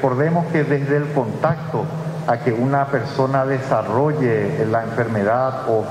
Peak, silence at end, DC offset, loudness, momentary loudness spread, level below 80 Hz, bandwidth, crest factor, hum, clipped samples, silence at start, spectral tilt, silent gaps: -4 dBFS; 0 s; under 0.1%; -19 LUFS; 4 LU; -56 dBFS; 12 kHz; 16 dB; none; under 0.1%; 0 s; -8.5 dB/octave; none